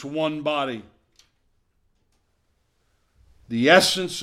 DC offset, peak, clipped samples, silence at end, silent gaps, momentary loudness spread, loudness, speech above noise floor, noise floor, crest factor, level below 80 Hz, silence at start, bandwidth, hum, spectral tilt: under 0.1%; 0 dBFS; under 0.1%; 0 s; none; 15 LU; -20 LUFS; 47 dB; -68 dBFS; 26 dB; -62 dBFS; 0 s; 16 kHz; none; -3.5 dB/octave